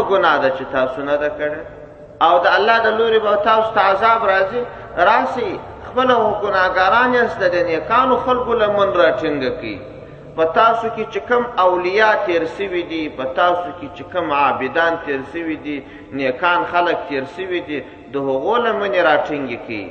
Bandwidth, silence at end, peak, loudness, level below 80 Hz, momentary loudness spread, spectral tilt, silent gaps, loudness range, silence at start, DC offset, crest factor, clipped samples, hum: 7.2 kHz; 0 s; 0 dBFS; -17 LUFS; -48 dBFS; 12 LU; -5.5 dB/octave; none; 5 LU; 0 s; under 0.1%; 16 dB; under 0.1%; none